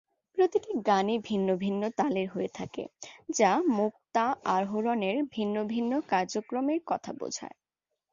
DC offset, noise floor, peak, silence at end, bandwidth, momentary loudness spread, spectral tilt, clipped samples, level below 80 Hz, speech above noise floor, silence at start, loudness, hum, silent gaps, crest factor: under 0.1%; -86 dBFS; -10 dBFS; 0.65 s; 7.6 kHz; 11 LU; -5 dB/octave; under 0.1%; -72 dBFS; 57 dB; 0.35 s; -29 LUFS; none; none; 20 dB